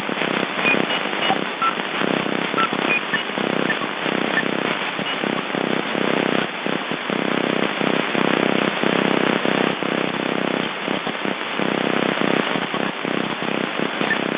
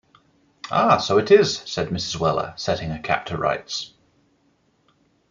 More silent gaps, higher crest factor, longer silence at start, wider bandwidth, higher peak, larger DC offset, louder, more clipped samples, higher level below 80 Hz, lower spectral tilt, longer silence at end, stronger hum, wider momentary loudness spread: neither; about the same, 20 dB vs 20 dB; second, 0 s vs 0.65 s; second, 4 kHz vs 7.6 kHz; about the same, -2 dBFS vs -2 dBFS; neither; about the same, -21 LUFS vs -21 LUFS; neither; second, -72 dBFS vs -54 dBFS; first, -8.5 dB/octave vs -4.5 dB/octave; second, 0 s vs 1.45 s; neither; second, 5 LU vs 12 LU